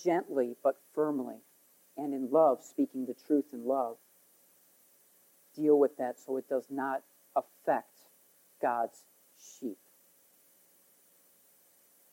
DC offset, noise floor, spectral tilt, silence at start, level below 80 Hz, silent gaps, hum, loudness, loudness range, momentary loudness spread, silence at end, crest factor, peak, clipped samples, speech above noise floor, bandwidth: under 0.1%; -65 dBFS; -6.5 dB/octave; 0 s; under -90 dBFS; none; none; -32 LUFS; 9 LU; 17 LU; 2.4 s; 20 dB; -14 dBFS; under 0.1%; 34 dB; 17 kHz